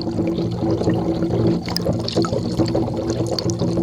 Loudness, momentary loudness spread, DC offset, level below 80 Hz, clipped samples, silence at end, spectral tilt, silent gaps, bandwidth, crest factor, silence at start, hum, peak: -21 LUFS; 2 LU; under 0.1%; -40 dBFS; under 0.1%; 0 s; -6.5 dB/octave; none; over 20 kHz; 18 dB; 0 s; none; -2 dBFS